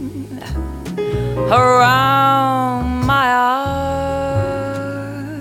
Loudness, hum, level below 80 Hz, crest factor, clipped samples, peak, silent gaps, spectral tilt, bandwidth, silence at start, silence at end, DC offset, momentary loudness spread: -16 LUFS; none; -32 dBFS; 16 dB; under 0.1%; 0 dBFS; none; -6 dB/octave; 16.5 kHz; 0 s; 0 s; under 0.1%; 14 LU